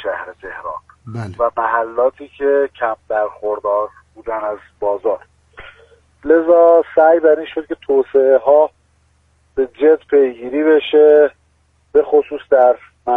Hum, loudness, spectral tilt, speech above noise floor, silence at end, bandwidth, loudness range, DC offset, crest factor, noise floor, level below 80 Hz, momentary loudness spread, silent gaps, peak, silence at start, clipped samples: none; -15 LUFS; -7.5 dB/octave; 44 dB; 0 s; 3.9 kHz; 7 LU; under 0.1%; 14 dB; -58 dBFS; -52 dBFS; 17 LU; none; 0 dBFS; 0 s; under 0.1%